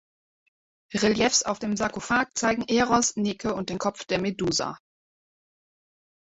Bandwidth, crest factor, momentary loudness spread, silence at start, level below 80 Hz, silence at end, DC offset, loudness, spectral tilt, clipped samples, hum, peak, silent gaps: 8.4 kHz; 20 dB; 8 LU; 0.9 s; -56 dBFS; 1.55 s; under 0.1%; -25 LUFS; -3 dB/octave; under 0.1%; none; -6 dBFS; none